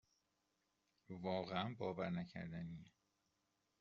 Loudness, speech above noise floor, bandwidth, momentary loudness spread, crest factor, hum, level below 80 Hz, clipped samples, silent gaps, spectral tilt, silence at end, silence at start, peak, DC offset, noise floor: -46 LUFS; 40 dB; 7 kHz; 11 LU; 24 dB; none; -78 dBFS; under 0.1%; none; -5 dB/octave; 0.9 s; 1.1 s; -24 dBFS; under 0.1%; -86 dBFS